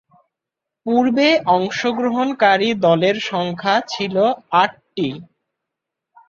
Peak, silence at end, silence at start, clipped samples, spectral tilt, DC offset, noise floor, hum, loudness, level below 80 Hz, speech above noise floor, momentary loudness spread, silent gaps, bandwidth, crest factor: -2 dBFS; 1.05 s; 0.85 s; under 0.1%; -5.5 dB/octave; under 0.1%; -84 dBFS; none; -17 LUFS; -62 dBFS; 67 dB; 10 LU; none; 7.6 kHz; 18 dB